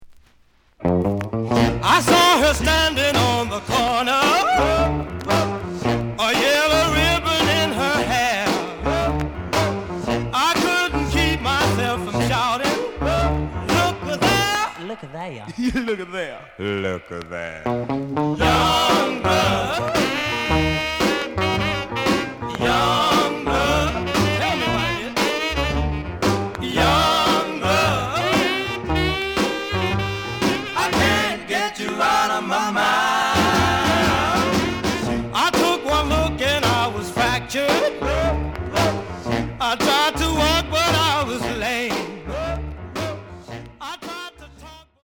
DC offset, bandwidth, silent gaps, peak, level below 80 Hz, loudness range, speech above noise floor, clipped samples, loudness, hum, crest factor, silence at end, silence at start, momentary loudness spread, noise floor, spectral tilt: under 0.1%; over 20 kHz; none; -2 dBFS; -34 dBFS; 4 LU; 36 dB; under 0.1%; -20 LUFS; none; 18 dB; 0.25 s; 0 s; 10 LU; -56 dBFS; -4 dB/octave